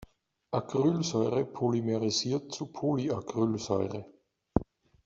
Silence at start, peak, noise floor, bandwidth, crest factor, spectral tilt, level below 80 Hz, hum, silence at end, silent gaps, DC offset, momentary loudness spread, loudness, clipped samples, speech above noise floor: 0.5 s; -6 dBFS; -57 dBFS; 8 kHz; 24 dB; -6 dB/octave; -54 dBFS; none; 0.45 s; none; under 0.1%; 7 LU; -31 LUFS; under 0.1%; 27 dB